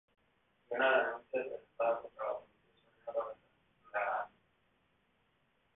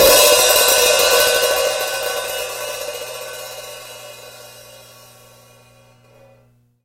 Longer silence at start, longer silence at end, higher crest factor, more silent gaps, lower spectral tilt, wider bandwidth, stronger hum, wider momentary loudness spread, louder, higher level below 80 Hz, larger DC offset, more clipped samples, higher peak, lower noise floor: first, 0.7 s vs 0 s; second, 1.5 s vs 2.25 s; about the same, 20 dB vs 18 dB; neither; second, 4 dB/octave vs 0.5 dB/octave; second, 3.9 kHz vs 17 kHz; second, none vs 60 Hz at -55 dBFS; second, 16 LU vs 24 LU; second, -37 LUFS vs -14 LUFS; second, -80 dBFS vs -48 dBFS; neither; neither; second, -18 dBFS vs 0 dBFS; first, -76 dBFS vs -55 dBFS